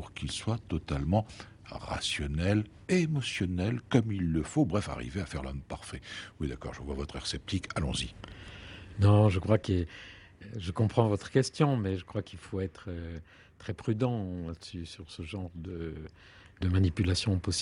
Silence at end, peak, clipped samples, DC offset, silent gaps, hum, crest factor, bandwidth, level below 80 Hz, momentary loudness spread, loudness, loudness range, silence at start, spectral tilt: 0 s; -10 dBFS; under 0.1%; under 0.1%; none; none; 22 dB; 11 kHz; -48 dBFS; 16 LU; -31 LUFS; 8 LU; 0 s; -6 dB/octave